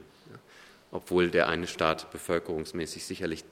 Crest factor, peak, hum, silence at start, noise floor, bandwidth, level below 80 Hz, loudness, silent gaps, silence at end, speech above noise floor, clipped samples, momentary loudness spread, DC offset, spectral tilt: 22 dB; -10 dBFS; none; 0 s; -55 dBFS; 16 kHz; -60 dBFS; -30 LUFS; none; 0.05 s; 25 dB; under 0.1%; 13 LU; under 0.1%; -4.5 dB/octave